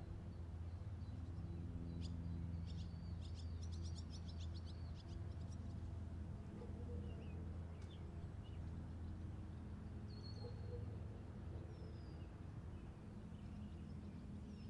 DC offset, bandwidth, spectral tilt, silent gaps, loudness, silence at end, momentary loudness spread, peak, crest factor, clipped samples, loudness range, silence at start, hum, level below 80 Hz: under 0.1%; 10.5 kHz; -7.5 dB/octave; none; -52 LUFS; 0 s; 5 LU; -36 dBFS; 14 dB; under 0.1%; 3 LU; 0 s; none; -58 dBFS